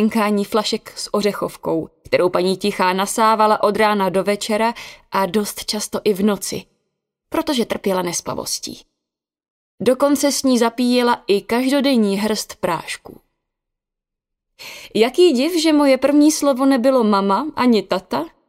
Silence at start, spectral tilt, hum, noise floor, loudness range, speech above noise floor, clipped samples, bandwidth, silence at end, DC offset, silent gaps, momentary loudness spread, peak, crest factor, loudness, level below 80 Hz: 0 s; -4 dB/octave; none; -84 dBFS; 7 LU; 66 dB; under 0.1%; 16 kHz; 0.2 s; under 0.1%; 9.50-9.78 s; 10 LU; -2 dBFS; 16 dB; -18 LUFS; -56 dBFS